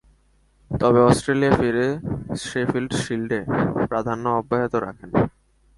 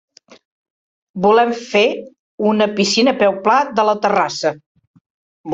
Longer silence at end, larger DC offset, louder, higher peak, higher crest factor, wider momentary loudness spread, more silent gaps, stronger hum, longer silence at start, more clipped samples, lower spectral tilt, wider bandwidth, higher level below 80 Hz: first, 0.5 s vs 0 s; neither; second, -22 LUFS vs -16 LUFS; about the same, -2 dBFS vs -2 dBFS; about the same, 20 dB vs 16 dB; about the same, 10 LU vs 11 LU; second, none vs 2.19-2.38 s, 4.66-4.75 s, 4.87-4.94 s, 5.01-5.44 s; neither; second, 0.7 s vs 1.15 s; neither; first, -6.5 dB/octave vs -4 dB/octave; first, 11.5 kHz vs 8 kHz; first, -46 dBFS vs -62 dBFS